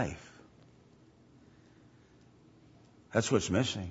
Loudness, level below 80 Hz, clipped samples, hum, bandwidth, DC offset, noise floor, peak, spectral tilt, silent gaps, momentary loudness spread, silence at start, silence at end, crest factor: -31 LUFS; -62 dBFS; under 0.1%; none; 8 kHz; under 0.1%; -61 dBFS; -12 dBFS; -4.5 dB/octave; none; 20 LU; 0 s; 0 s; 24 dB